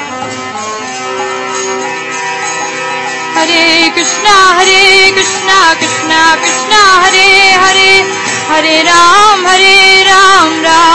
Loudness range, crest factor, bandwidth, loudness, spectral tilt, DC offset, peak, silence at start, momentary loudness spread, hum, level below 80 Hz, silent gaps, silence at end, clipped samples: 8 LU; 8 dB; 11 kHz; -5 LUFS; -0.5 dB/octave; under 0.1%; 0 dBFS; 0 s; 13 LU; none; -42 dBFS; none; 0 s; 4%